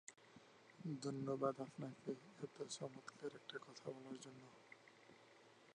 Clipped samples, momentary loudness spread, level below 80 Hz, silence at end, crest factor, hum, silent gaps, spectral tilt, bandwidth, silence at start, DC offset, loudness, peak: under 0.1%; 22 LU; under -90 dBFS; 0 s; 22 dB; none; none; -5.5 dB/octave; 10 kHz; 0.1 s; under 0.1%; -50 LUFS; -28 dBFS